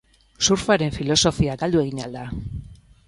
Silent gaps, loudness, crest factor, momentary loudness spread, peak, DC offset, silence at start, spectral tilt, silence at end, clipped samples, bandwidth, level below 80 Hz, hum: none; -21 LUFS; 18 dB; 14 LU; -4 dBFS; under 0.1%; 0.4 s; -4 dB/octave; 0.3 s; under 0.1%; 11.5 kHz; -40 dBFS; none